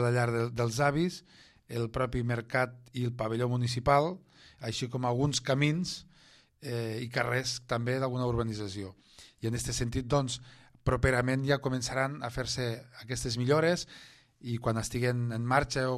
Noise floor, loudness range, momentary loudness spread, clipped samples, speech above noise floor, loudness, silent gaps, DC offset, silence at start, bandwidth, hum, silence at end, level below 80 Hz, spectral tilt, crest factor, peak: -61 dBFS; 3 LU; 11 LU; under 0.1%; 30 dB; -31 LUFS; none; under 0.1%; 0 s; 13 kHz; none; 0 s; -50 dBFS; -5 dB/octave; 22 dB; -10 dBFS